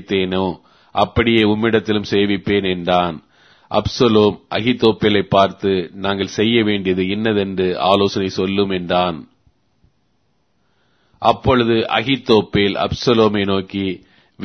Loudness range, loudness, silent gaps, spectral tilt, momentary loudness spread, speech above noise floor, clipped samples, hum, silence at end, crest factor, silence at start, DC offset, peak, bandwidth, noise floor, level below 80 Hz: 4 LU; -17 LUFS; none; -6 dB/octave; 8 LU; 49 dB; under 0.1%; none; 0 s; 18 dB; 0 s; under 0.1%; 0 dBFS; 6.6 kHz; -65 dBFS; -44 dBFS